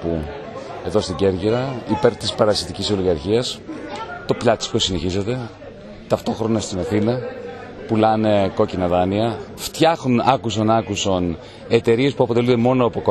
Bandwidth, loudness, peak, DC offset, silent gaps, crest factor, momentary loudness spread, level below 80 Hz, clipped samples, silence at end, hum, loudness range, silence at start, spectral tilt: 13 kHz; -20 LUFS; 0 dBFS; under 0.1%; none; 20 dB; 14 LU; -44 dBFS; under 0.1%; 0 s; none; 4 LU; 0 s; -5.5 dB/octave